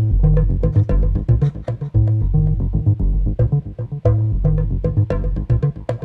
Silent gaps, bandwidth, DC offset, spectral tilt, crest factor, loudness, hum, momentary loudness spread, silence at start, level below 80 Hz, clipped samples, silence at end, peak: none; 3.5 kHz; under 0.1%; -11.5 dB/octave; 12 dB; -19 LUFS; none; 4 LU; 0 s; -20 dBFS; under 0.1%; 0 s; -4 dBFS